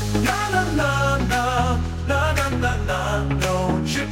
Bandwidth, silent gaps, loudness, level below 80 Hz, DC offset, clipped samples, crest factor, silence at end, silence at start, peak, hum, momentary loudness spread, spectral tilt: 17 kHz; none; -21 LUFS; -30 dBFS; under 0.1%; under 0.1%; 16 dB; 0 s; 0 s; -4 dBFS; none; 3 LU; -5 dB/octave